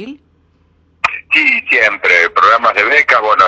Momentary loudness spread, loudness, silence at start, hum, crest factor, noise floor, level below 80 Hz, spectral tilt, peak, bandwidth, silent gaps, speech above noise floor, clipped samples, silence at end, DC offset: 7 LU; -10 LUFS; 0 s; none; 12 dB; -53 dBFS; -54 dBFS; -2 dB/octave; 0 dBFS; 9.2 kHz; none; 43 dB; under 0.1%; 0 s; under 0.1%